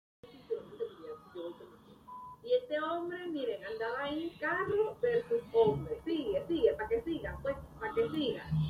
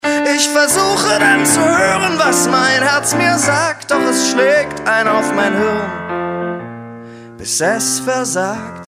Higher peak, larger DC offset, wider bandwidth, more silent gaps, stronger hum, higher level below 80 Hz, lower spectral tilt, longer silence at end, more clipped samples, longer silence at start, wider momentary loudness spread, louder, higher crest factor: second, -16 dBFS vs 0 dBFS; neither; second, 13.5 kHz vs 16 kHz; neither; neither; second, -58 dBFS vs -52 dBFS; first, -7.5 dB/octave vs -2.5 dB/octave; about the same, 0 s vs 0 s; neither; first, 0.25 s vs 0.05 s; first, 15 LU vs 10 LU; second, -34 LUFS vs -13 LUFS; about the same, 18 dB vs 14 dB